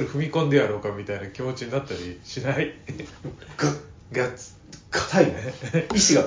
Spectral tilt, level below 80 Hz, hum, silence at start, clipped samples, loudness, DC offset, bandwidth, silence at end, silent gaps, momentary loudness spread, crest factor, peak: -4 dB/octave; -50 dBFS; none; 0 s; under 0.1%; -25 LUFS; under 0.1%; 7.8 kHz; 0 s; none; 17 LU; 22 dB; -2 dBFS